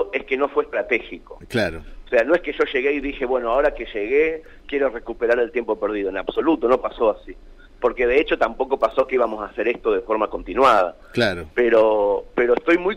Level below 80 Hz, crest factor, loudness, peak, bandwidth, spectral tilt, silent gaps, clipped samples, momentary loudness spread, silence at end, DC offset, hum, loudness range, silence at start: -44 dBFS; 14 dB; -21 LUFS; -6 dBFS; 11.5 kHz; -6 dB/octave; none; under 0.1%; 7 LU; 0 s; under 0.1%; none; 3 LU; 0 s